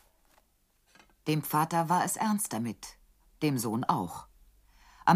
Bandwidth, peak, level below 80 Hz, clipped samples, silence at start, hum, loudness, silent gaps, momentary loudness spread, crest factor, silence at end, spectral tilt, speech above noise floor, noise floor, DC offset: 15.5 kHz; -10 dBFS; -64 dBFS; under 0.1%; 1.25 s; none; -30 LUFS; none; 12 LU; 22 dB; 0 s; -5 dB/octave; 40 dB; -70 dBFS; under 0.1%